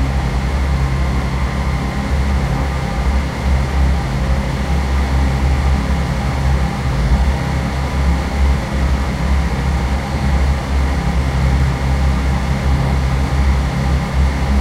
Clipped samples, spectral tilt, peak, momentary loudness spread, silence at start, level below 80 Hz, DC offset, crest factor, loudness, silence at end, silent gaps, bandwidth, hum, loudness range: under 0.1%; -6.5 dB/octave; -2 dBFS; 3 LU; 0 s; -18 dBFS; under 0.1%; 12 dB; -17 LUFS; 0 s; none; 12 kHz; none; 1 LU